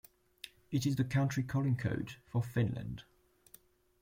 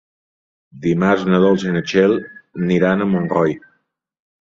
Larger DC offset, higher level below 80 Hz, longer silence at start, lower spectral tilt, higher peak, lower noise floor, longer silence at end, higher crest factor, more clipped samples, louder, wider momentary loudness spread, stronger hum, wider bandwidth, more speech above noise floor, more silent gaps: neither; second, -62 dBFS vs -54 dBFS; second, 0.45 s vs 0.75 s; about the same, -6.5 dB/octave vs -7.5 dB/octave; second, -20 dBFS vs -2 dBFS; about the same, -63 dBFS vs -66 dBFS; about the same, 1 s vs 0.95 s; about the same, 16 dB vs 16 dB; neither; second, -35 LUFS vs -17 LUFS; first, 17 LU vs 10 LU; neither; first, 16.5 kHz vs 7.4 kHz; second, 30 dB vs 50 dB; neither